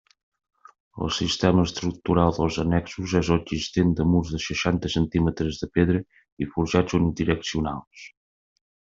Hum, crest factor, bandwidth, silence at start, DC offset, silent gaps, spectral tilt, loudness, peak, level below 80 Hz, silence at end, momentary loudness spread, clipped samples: none; 20 dB; 7.6 kHz; 0.95 s; under 0.1%; 6.32-6.37 s, 7.87-7.91 s; -6 dB/octave; -24 LUFS; -4 dBFS; -44 dBFS; 0.9 s; 8 LU; under 0.1%